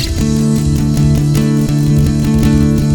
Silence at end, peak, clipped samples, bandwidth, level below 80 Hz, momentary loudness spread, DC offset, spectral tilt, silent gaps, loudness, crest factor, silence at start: 0 s; 0 dBFS; under 0.1%; 18 kHz; -22 dBFS; 2 LU; under 0.1%; -7 dB/octave; none; -12 LUFS; 12 dB; 0 s